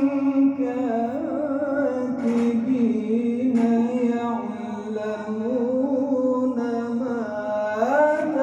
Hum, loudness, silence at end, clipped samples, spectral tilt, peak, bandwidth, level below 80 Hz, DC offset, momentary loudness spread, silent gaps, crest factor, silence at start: none; -23 LUFS; 0 s; under 0.1%; -7.5 dB/octave; -8 dBFS; 8.4 kHz; -66 dBFS; under 0.1%; 7 LU; none; 14 dB; 0 s